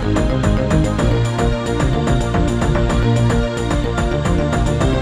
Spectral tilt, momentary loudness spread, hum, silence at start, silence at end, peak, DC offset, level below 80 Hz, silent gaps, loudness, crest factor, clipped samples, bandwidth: -6.5 dB/octave; 3 LU; none; 0 s; 0 s; -2 dBFS; under 0.1%; -22 dBFS; none; -17 LUFS; 14 dB; under 0.1%; 10.5 kHz